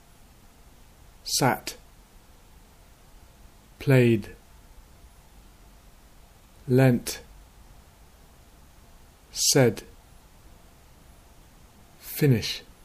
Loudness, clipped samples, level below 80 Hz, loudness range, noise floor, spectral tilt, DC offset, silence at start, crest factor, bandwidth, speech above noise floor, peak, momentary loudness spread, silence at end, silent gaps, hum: -24 LUFS; under 0.1%; -52 dBFS; 4 LU; -53 dBFS; -4.5 dB/octave; under 0.1%; 1.25 s; 22 dB; 15.5 kHz; 31 dB; -6 dBFS; 20 LU; 0.25 s; none; none